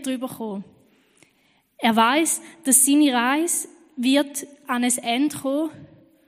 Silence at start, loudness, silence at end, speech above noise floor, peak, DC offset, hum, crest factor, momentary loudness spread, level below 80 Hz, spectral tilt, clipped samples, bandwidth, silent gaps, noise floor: 0 s; -20 LUFS; 0.4 s; 42 dB; -2 dBFS; under 0.1%; none; 22 dB; 15 LU; -74 dBFS; -2 dB/octave; under 0.1%; 15.5 kHz; none; -63 dBFS